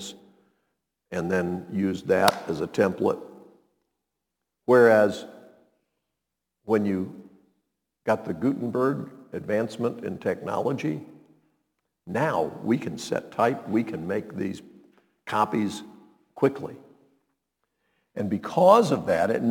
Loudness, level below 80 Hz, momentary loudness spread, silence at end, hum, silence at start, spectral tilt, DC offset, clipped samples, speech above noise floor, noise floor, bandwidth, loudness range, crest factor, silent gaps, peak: -25 LUFS; -66 dBFS; 18 LU; 0 s; none; 0 s; -6 dB/octave; under 0.1%; under 0.1%; 60 dB; -84 dBFS; 19 kHz; 6 LU; 26 dB; none; 0 dBFS